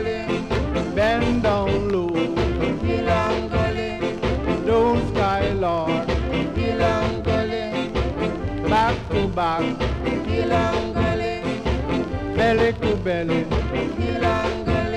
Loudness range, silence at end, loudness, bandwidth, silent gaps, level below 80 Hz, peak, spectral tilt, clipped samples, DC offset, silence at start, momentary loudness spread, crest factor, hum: 1 LU; 0 s; -22 LUFS; 11 kHz; none; -32 dBFS; -8 dBFS; -7 dB/octave; under 0.1%; under 0.1%; 0 s; 5 LU; 12 dB; none